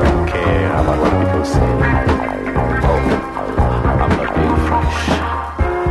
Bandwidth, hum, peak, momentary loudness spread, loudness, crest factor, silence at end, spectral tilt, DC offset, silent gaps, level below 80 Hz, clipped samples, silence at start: 12 kHz; none; -2 dBFS; 4 LU; -16 LUFS; 14 dB; 0 s; -7 dB/octave; under 0.1%; none; -22 dBFS; under 0.1%; 0 s